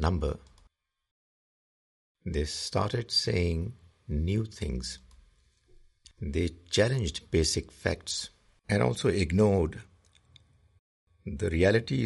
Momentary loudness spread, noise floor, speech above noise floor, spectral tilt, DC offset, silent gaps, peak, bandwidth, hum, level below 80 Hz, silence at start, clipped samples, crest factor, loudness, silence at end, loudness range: 16 LU; -67 dBFS; 38 dB; -5 dB/octave; under 0.1%; 1.11-2.15 s, 10.79-11.07 s; -10 dBFS; 11.5 kHz; none; -44 dBFS; 0 s; under 0.1%; 20 dB; -29 LUFS; 0 s; 5 LU